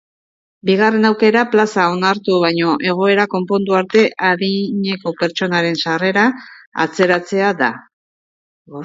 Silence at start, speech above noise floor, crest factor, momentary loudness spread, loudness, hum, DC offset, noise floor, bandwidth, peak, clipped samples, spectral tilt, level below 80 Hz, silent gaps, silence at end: 0.65 s; over 75 dB; 16 dB; 7 LU; -15 LUFS; none; under 0.1%; under -90 dBFS; 7.8 kHz; 0 dBFS; under 0.1%; -5.5 dB/octave; -64 dBFS; 6.67-6.72 s, 7.93-8.65 s; 0 s